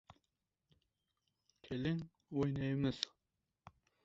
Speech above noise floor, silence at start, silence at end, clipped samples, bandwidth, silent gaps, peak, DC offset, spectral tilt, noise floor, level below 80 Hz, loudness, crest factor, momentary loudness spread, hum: 50 dB; 1.65 s; 0.95 s; under 0.1%; 7.6 kHz; none; -16 dBFS; under 0.1%; -6 dB/octave; -88 dBFS; -66 dBFS; -40 LUFS; 28 dB; 7 LU; none